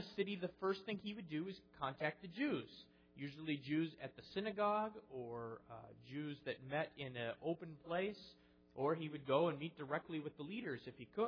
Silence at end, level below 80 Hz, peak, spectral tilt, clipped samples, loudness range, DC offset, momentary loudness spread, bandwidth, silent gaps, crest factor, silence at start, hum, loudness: 0 s; -78 dBFS; -22 dBFS; -4.5 dB/octave; under 0.1%; 3 LU; under 0.1%; 13 LU; 5.4 kHz; none; 20 dB; 0 s; none; -44 LUFS